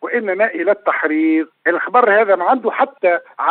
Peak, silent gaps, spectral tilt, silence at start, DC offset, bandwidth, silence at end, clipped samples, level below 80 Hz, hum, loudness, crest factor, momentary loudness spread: 0 dBFS; none; -9.5 dB/octave; 0 s; under 0.1%; 4.3 kHz; 0 s; under 0.1%; -82 dBFS; none; -16 LUFS; 16 dB; 6 LU